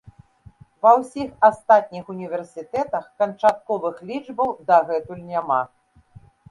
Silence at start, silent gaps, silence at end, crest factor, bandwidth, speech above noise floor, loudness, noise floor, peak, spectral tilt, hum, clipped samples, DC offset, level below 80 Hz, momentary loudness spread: 0.85 s; none; 0.85 s; 20 dB; 11.5 kHz; 29 dB; -21 LUFS; -50 dBFS; -2 dBFS; -6 dB/octave; none; under 0.1%; under 0.1%; -60 dBFS; 14 LU